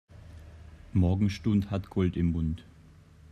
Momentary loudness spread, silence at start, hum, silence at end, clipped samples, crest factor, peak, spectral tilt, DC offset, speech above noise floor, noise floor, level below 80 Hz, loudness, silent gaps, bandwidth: 23 LU; 0.15 s; none; 0.7 s; under 0.1%; 16 dB; -14 dBFS; -8.5 dB/octave; under 0.1%; 27 dB; -54 dBFS; -48 dBFS; -29 LUFS; none; 9.2 kHz